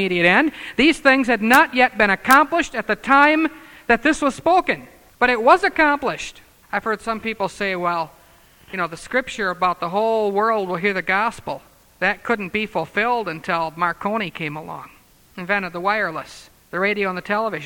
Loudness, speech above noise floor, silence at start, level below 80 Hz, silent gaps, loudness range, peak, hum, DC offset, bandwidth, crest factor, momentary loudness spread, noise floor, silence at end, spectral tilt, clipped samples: -19 LUFS; 31 dB; 0 s; -50 dBFS; none; 8 LU; 0 dBFS; none; under 0.1%; over 20 kHz; 20 dB; 14 LU; -51 dBFS; 0 s; -4.5 dB/octave; under 0.1%